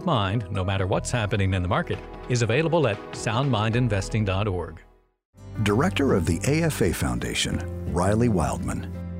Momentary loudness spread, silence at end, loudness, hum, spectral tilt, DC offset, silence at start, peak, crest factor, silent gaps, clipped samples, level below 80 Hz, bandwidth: 8 LU; 0 s; -25 LUFS; none; -5.5 dB/octave; under 0.1%; 0 s; -10 dBFS; 16 dB; 5.25-5.33 s; under 0.1%; -40 dBFS; 16 kHz